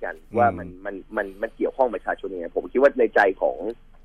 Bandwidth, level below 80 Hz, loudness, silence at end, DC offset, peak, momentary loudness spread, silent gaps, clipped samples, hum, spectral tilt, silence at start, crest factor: 9.8 kHz; -48 dBFS; -23 LUFS; 0.3 s; under 0.1%; -6 dBFS; 14 LU; none; under 0.1%; none; -7.5 dB/octave; 0 s; 18 dB